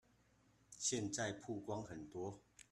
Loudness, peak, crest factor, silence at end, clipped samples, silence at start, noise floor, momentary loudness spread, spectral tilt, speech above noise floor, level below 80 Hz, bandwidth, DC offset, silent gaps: -44 LUFS; -26 dBFS; 20 dB; 0.1 s; under 0.1%; 0.7 s; -74 dBFS; 12 LU; -3.5 dB/octave; 29 dB; -76 dBFS; 13 kHz; under 0.1%; none